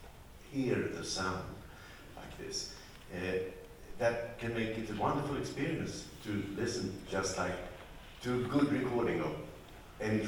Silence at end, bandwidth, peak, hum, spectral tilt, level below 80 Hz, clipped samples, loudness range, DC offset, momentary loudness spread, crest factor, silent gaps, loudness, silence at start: 0 s; 19.5 kHz; -18 dBFS; none; -5 dB/octave; -56 dBFS; under 0.1%; 4 LU; under 0.1%; 18 LU; 20 dB; none; -36 LUFS; 0 s